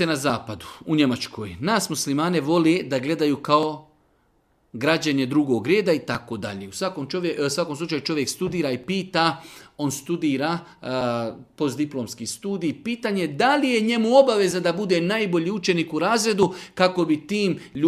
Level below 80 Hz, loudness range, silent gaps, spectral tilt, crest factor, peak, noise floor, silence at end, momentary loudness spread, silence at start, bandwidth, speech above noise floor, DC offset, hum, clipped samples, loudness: -60 dBFS; 5 LU; none; -5 dB/octave; 20 dB; -2 dBFS; -64 dBFS; 0 s; 10 LU; 0 s; 15.5 kHz; 42 dB; under 0.1%; none; under 0.1%; -23 LUFS